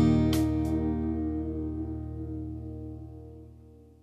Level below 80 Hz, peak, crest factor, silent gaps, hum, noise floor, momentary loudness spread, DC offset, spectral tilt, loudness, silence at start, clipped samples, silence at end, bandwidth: -40 dBFS; -12 dBFS; 18 dB; none; none; -52 dBFS; 20 LU; under 0.1%; -8 dB/octave; -31 LUFS; 0 s; under 0.1%; 0.2 s; 14 kHz